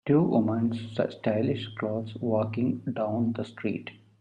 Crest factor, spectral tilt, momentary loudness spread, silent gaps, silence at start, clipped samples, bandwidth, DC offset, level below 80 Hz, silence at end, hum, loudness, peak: 18 dB; -9 dB/octave; 8 LU; none; 0.05 s; under 0.1%; 8.6 kHz; under 0.1%; -66 dBFS; 0.25 s; none; -29 LUFS; -10 dBFS